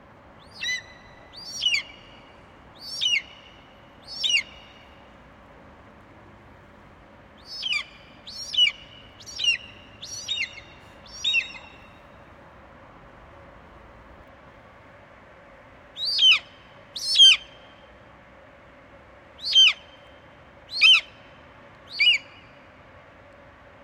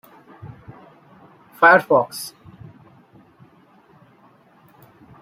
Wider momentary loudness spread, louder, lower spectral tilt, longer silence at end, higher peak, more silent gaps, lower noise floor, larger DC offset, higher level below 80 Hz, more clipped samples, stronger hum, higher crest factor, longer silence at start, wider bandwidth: about the same, 27 LU vs 29 LU; second, -20 LUFS vs -16 LUFS; second, 1 dB/octave vs -4.5 dB/octave; second, 1.65 s vs 2.95 s; second, -6 dBFS vs -2 dBFS; neither; about the same, -50 dBFS vs -53 dBFS; neither; about the same, -60 dBFS vs -64 dBFS; neither; neither; about the same, 22 dB vs 22 dB; second, 0.55 s vs 1.6 s; about the same, 16.5 kHz vs 16 kHz